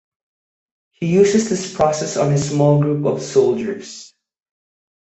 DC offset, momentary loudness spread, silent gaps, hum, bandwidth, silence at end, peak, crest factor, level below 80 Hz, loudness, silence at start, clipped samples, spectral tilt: under 0.1%; 12 LU; none; none; 8.4 kHz; 0.95 s; -2 dBFS; 16 dB; -54 dBFS; -17 LUFS; 1 s; under 0.1%; -6 dB/octave